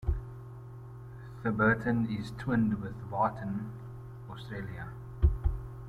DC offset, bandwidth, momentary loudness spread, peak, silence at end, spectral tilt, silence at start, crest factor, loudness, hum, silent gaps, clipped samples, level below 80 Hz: under 0.1%; 11 kHz; 19 LU; -12 dBFS; 0 s; -8.5 dB/octave; 0 s; 20 dB; -32 LUFS; none; none; under 0.1%; -38 dBFS